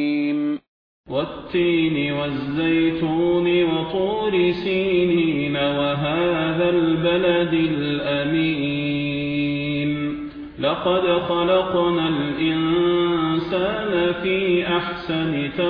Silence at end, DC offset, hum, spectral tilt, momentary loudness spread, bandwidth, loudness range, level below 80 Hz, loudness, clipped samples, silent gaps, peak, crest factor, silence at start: 0 s; under 0.1%; none; -9 dB/octave; 6 LU; 5.2 kHz; 2 LU; -48 dBFS; -21 LUFS; under 0.1%; 0.68-1.04 s; -8 dBFS; 14 dB; 0 s